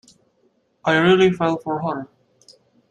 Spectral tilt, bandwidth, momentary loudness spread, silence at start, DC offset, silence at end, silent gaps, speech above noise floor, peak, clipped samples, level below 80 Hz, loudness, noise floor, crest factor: -6.5 dB/octave; 9.2 kHz; 14 LU; 0.85 s; under 0.1%; 0.85 s; none; 46 dB; -4 dBFS; under 0.1%; -60 dBFS; -19 LUFS; -64 dBFS; 18 dB